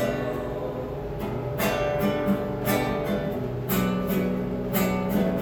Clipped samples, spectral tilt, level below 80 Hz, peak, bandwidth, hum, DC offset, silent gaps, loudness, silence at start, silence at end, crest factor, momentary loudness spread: under 0.1%; -6 dB/octave; -42 dBFS; -10 dBFS; over 20 kHz; none; under 0.1%; none; -27 LUFS; 0 s; 0 s; 16 dB; 7 LU